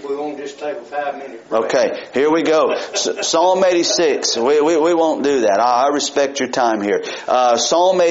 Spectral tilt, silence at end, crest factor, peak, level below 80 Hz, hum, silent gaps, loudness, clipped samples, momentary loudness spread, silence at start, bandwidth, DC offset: -1.5 dB/octave; 0 s; 14 dB; -2 dBFS; -64 dBFS; none; none; -16 LUFS; under 0.1%; 10 LU; 0 s; 8 kHz; under 0.1%